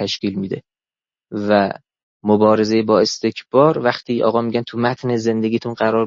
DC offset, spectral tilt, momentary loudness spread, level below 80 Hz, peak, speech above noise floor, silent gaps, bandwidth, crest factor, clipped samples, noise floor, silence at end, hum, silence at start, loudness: under 0.1%; -6 dB/octave; 12 LU; -62 dBFS; 0 dBFS; over 73 dB; 2.03-2.20 s; 7.6 kHz; 16 dB; under 0.1%; under -90 dBFS; 0 s; none; 0 s; -18 LUFS